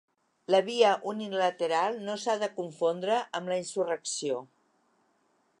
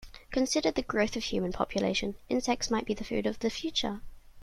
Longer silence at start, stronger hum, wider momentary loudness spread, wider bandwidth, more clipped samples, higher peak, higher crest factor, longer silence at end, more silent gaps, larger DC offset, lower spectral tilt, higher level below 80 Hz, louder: first, 0.5 s vs 0 s; neither; first, 8 LU vs 4 LU; second, 11 kHz vs 14.5 kHz; neither; first, -8 dBFS vs -12 dBFS; about the same, 22 dB vs 18 dB; first, 1.15 s vs 0 s; neither; neither; about the same, -3.5 dB/octave vs -4 dB/octave; second, -86 dBFS vs -50 dBFS; about the same, -29 LUFS vs -31 LUFS